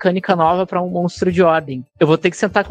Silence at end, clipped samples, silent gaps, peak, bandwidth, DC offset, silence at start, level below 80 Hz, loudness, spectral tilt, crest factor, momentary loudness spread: 0 s; under 0.1%; none; 0 dBFS; 9.4 kHz; under 0.1%; 0 s; -50 dBFS; -16 LUFS; -6.5 dB/octave; 16 dB; 5 LU